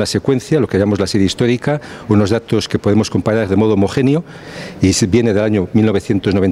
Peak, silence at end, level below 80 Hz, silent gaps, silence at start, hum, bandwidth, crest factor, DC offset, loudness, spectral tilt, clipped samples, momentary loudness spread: 0 dBFS; 0 s; -46 dBFS; none; 0 s; none; 14 kHz; 14 dB; under 0.1%; -15 LUFS; -6 dB/octave; under 0.1%; 4 LU